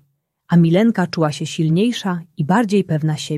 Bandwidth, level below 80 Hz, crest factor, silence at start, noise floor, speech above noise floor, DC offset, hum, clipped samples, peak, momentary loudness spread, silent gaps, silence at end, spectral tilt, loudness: 12.5 kHz; -60 dBFS; 16 dB; 0.5 s; -57 dBFS; 40 dB; under 0.1%; none; under 0.1%; -2 dBFS; 7 LU; none; 0 s; -6.5 dB/octave; -17 LUFS